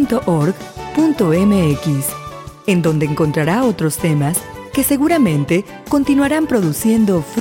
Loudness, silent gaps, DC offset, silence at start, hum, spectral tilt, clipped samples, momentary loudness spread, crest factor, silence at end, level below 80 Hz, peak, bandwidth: -16 LUFS; none; under 0.1%; 0 s; none; -6 dB/octave; under 0.1%; 8 LU; 12 dB; 0 s; -42 dBFS; -2 dBFS; 17 kHz